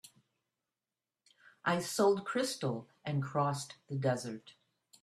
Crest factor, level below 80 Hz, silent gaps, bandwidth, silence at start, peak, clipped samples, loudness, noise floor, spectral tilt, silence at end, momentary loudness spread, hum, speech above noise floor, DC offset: 20 dB; -76 dBFS; none; 14 kHz; 0.05 s; -16 dBFS; under 0.1%; -35 LUFS; under -90 dBFS; -5 dB/octave; 0.5 s; 12 LU; none; over 56 dB; under 0.1%